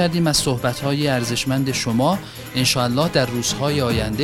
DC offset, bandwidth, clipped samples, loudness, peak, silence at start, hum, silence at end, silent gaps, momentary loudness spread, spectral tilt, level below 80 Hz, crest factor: under 0.1%; 16.5 kHz; under 0.1%; -20 LUFS; -2 dBFS; 0 s; none; 0 s; none; 4 LU; -4.5 dB/octave; -40 dBFS; 18 dB